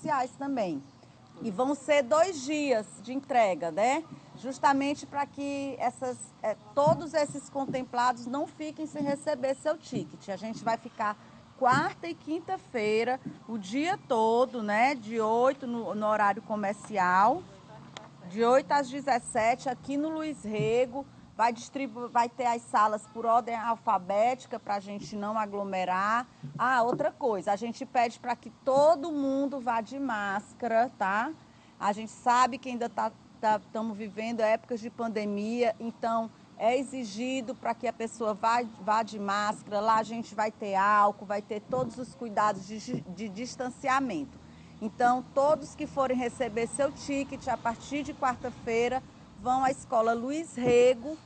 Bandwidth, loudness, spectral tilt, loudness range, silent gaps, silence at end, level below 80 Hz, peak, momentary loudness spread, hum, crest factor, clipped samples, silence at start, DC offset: 9 kHz; -29 LUFS; -5 dB/octave; 4 LU; none; 0.05 s; -64 dBFS; -12 dBFS; 11 LU; none; 18 dB; under 0.1%; 0 s; under 0.1%